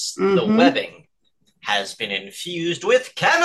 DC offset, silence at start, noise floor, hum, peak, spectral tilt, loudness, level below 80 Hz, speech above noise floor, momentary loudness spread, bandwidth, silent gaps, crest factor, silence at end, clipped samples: under 0.1%; 0 s; -66 dBFS; none; -2 dBFS; -4 dB/octave; -20 LUFS; -66 dBFS; 47 dB; 11 LU; 12.5 kHz; none; 18 dB; 0 s; under 0.1%